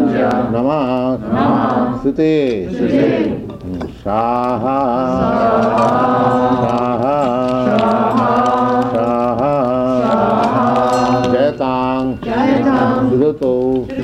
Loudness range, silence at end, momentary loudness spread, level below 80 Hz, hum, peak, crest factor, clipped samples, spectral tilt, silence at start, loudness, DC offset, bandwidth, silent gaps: 2 LU; 0 s; 4 LU; -42 dBFS; none; -4 dBFS; 10 dB; under 0.1%; -7.5 dB/octave; 0 s; -15 LUFS; under 0.1%; 9.8 kHz; none